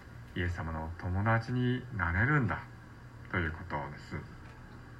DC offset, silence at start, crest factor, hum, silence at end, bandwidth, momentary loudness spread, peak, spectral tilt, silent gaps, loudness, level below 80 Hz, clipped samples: under 0.1%; 0 s; 20 dB; none; 0 s; 8.4 kHz; 21 LU; -14 dBFS; -8 dB/octave; none; -34 LUFS; -50 dBFS; under 0.1%